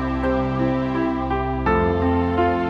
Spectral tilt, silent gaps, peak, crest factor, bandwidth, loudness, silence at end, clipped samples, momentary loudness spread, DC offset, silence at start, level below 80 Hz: -9 dB/octave; none; -6 dBFS; 14 dB; 6.4 kHz; -21 LUFS; 0 s; under 0.1%; 3 LU; under 0.1%; 0 s; -32 dBFS